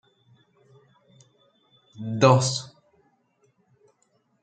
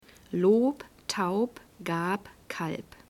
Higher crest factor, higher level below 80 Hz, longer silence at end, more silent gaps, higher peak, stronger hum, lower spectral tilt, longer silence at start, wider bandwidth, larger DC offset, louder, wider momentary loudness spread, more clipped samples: first, 26 dB vs 18 dB; about the same, -68 dBFS vs -64 dBFS; first, 1.75 s vs 0.3 s; neither; first, -2 dBFS vs -12 dBFS; neither; about the same, -5 dB/octave vs -5.5 dB/octave; first, 1.95 s vs 0.3 s; second, 9.2 kHz vs 17 kHz; neither; first, -21 LUFS vs -29 LUFS; first, 21 LU vs 13 LU; neither